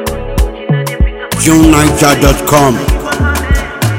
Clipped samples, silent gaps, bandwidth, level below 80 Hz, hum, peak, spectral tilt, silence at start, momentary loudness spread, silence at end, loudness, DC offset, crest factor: 2%; none; over 20 kHz; -16 dBFS; none; 0 dBFS; -5 dB/octave; 0 s; 9 LU; 0 s; -10 LUFS; under 0.1%; 10 dB